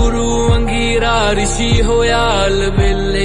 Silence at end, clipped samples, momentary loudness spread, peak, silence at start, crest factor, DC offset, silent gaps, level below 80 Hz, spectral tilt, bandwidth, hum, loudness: 0 s; under 0.1%; 2 LU; -2 dBFS; 0 s; 10 dB; under 0.1%; none; -18 dBFS; -4.5 dB/octave; 11 kHz; none; -14 LUFS